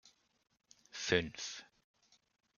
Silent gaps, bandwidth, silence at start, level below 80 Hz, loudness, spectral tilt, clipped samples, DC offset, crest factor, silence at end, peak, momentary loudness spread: none; 7.4 kHz; 0.95 s; -70 dBFS; -37 LUFS; -3 dB/octave; under 0.1%; under 0.1%; 28 dB; 0.95 s; -14 dBFS; 17 LU